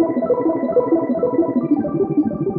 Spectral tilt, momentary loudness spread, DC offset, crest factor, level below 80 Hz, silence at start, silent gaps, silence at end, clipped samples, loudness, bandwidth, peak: -13 dB/octave; 2 LU; under 0.1%; 12 dB; -54 dBFS; 0 s; none; 0 s; under 0.1%; -18 LUFS; 4 kHz; -6 dBFS